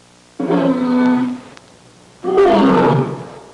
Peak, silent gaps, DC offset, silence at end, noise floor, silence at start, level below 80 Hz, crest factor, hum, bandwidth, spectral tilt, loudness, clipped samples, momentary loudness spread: -6 dBFS; none; under 0.1%; 0.15 s; -45 dBFS; 0.4 s; -50 dBFS; 10 dB; none; 10.5 kHz; -7.5 dB/octave; -15 LUFS; under 0.1%; 15 LU